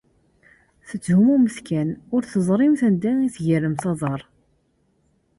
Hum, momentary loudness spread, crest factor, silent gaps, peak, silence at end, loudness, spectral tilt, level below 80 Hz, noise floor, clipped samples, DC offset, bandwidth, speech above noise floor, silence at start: none; 10 LU; 14 dB; none; -8 dBFS; 1.15 s; -21 LUFS; -8 dB/octave; -58 dBFS; -65 dBFS; under 0.1%; under 0.1%; 11.5 kHz; 45 dB; 0.85 s